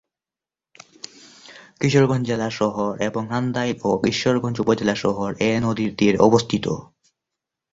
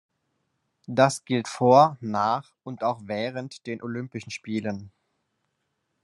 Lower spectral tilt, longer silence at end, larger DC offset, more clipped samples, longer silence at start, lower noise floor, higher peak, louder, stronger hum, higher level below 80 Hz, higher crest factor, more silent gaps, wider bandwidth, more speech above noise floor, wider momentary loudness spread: about the same, -6 dB/octave vs -5.5 dB/octave; second, 0.9 s vs 1.15 s; neither; neither; first, 1.45 s vs 0.9 s; first, under -90 dBFS vs -77 dBFS; about the same, -2 dBFS vs -4 dBFS; first, -21 LUFS vs -25 LUFS; neither; first, -52 dBFS vs -74 dBFS; about the same, 20 dB vs 22 dB; neither; second, 8 kHz vs 12 kHz; first, over 70 dB vs 52 dB; second, 10 LU vs 17 LU